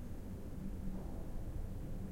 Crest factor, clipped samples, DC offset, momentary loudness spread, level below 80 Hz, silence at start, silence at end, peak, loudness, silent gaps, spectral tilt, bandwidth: 12 dB; under 0.1%; under 0.1%; 2 LU; -46 dBFS; 0 s; 0 s; -30 dBFS; -47 LUFS; none; -8 dB/octave; 16.5 kHz